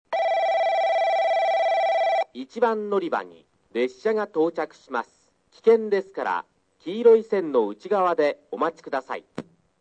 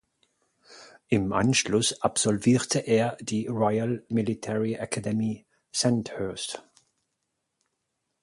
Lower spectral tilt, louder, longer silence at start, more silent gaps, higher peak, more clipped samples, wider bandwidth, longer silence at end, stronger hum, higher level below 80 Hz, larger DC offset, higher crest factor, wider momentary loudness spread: about the same, -5.5 dB/octave vs -4.5 dB/octave; about the same, -24 LUFS vs -26 LUFS; second, 0.1 s vs 0.7 s; neither; about the same, -6 dBFS vs -8 dBFS; neither; second, 8.4 kHz vs 11.5 kHz; second, 0.4 s vs 1.6 s; neither; second, -76 dBFS vs -58 dBFS; neither; about the same, 18 dB vs 20 dB; first, 12 LU vs 9 LU